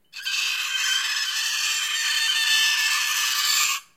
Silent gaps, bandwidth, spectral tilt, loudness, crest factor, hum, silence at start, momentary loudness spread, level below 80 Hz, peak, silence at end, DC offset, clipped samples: none; 16.5 kHz; 5.5 dB/octave; -21 LUFS; 16 dB; none; 0.15 s; 5 LU; -78 dBFS; -8 dBFS; 0.15 s; under 0.1%; under 0.1%